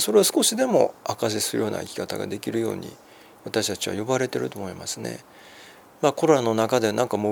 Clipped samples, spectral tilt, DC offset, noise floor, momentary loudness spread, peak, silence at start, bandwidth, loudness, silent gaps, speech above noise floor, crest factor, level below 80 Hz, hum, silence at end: under 0.1%; -3.5 dB/octave; under 0.1%; -48 dBFS; 13 LU; -4 dBFS; 0 s; 19.5 kHz; -24 LUFS; none; 24 dB; 20 dB; -68 dBFS; none; 0 s